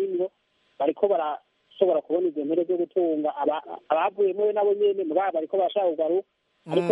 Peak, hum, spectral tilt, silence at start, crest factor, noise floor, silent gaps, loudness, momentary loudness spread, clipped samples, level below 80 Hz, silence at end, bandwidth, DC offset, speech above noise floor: -6 dBFS; none; -8 dB/octave; 0 s; 18 dB; -68 dBFS; none; -25 LUFS; 6 LU; under 0.1%; -82 dBFS; 0 s; 4.2 kHz; under 0.1%; 44 dB